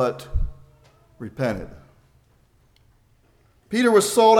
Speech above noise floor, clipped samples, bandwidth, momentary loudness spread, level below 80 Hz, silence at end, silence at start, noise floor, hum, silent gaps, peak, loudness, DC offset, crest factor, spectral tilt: 40 dB; under 0.1%; 18 kHz; 22 LU; -36 dBFS; 0 s; 0 s; -59 dBFS; none; none; -2 dBFS; -22 LUFS; under 0.1%; 22 dB; -4.5 dB/octave